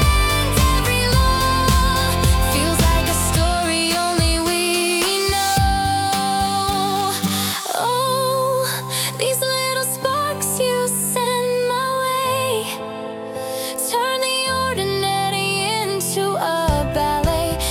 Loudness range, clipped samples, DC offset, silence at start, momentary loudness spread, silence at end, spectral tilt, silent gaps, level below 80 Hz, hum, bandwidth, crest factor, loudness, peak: 4 LU; under 0.1%; under 0.1%; 0 s; 4 LU; 0 s; -3.5 dB/octave; none; -28 dBFS; none; 20 kHz; 16 dB; -19 LUFS; -4 dBFS